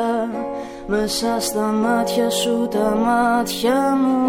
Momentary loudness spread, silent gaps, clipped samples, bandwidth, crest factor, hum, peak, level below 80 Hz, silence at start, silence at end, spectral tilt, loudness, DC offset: 7 LU; none; under 0.1%; 16.5 kHz; 12 dB; none; -6 dBFS; -46 dBFS; 0 s; 0 s; -4 dB/octave; -19 LUFS; under 0.1%